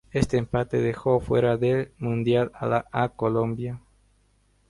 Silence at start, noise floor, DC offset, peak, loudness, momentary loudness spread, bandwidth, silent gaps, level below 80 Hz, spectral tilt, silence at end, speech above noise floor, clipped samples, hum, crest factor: 0.15 s; -64 dBFS; under 0.1%; -6 dBFS; -25 LUFS; 7 LU; 11.5 kHz; none; -46 dBFS; -7.5 dB/octave; 0.9 s; 40 dB; under 0.1%; 50 Hz at -50 dBFS; 20 dB